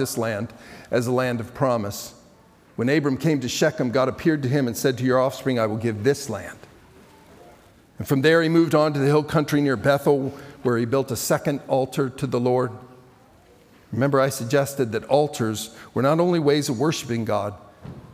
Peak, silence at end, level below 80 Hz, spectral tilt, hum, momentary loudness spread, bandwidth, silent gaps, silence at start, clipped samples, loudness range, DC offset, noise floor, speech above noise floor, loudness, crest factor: -4 dBFS; 0 s; -58 dBFS; -5.5 dB/octave; none; 12 LU; 16.5 kHz; none; 0 s; under 0.1%; 4 LU; under 0.1%; -53 dBFS; 31 dB; -22 LUFS; 18 dB